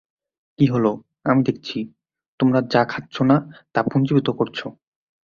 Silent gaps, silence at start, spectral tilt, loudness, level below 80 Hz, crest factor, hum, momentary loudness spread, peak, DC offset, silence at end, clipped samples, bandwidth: 2.28-2.38 s; 0.6 s; -8 dB/octave; -21 LUFS; -58 dBFS; 20 dB; none; 11 LU; -2 dBFS; under 0.1%; 0.55 s; under 0.1%; 7 kHz